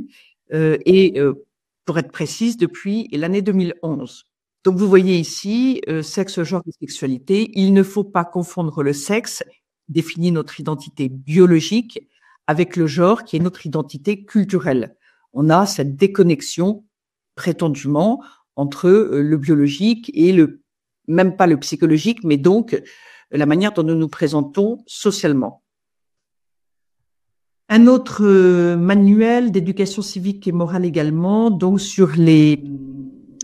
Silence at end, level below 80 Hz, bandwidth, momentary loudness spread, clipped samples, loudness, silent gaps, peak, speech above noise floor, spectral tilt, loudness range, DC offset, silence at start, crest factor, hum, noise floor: 0 s; -62 dBFS; 14 kHz; 13 LU; under 0.1%; -17 LUFS; none; 0 dBFS; 70 dB; -6.5 dB/octave; 5 LU; under 0.1%; 0 s; 16 dB; none; -86 dBFS